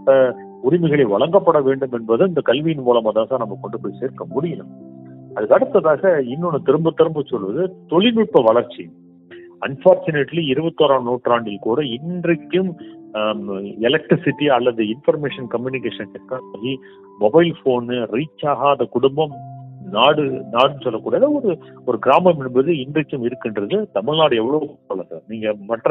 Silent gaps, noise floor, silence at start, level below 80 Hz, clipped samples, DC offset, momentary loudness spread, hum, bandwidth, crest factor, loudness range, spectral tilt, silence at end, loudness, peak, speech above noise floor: none; -41 dBFS; 0 s; -62 dBFS; under 0.1%; under 0.1%; 13 LU; none; 4.1 kHz; 18 dB; 4 LU; -9 dB/octave; 0 s; -18 LUFS; 0 dBFS; 24 dB